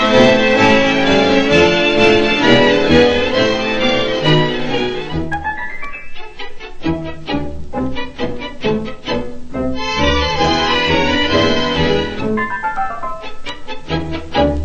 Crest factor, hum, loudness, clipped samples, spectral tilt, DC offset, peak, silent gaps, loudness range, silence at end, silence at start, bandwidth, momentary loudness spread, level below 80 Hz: 14 dB; none; -15 LUFS; under 0.1%; -5 dB/octave; 1%; 0 dBFS; none; 12 LU; 0 s; 0 s; 8.6 kHz; 16 LU; -32 dBFS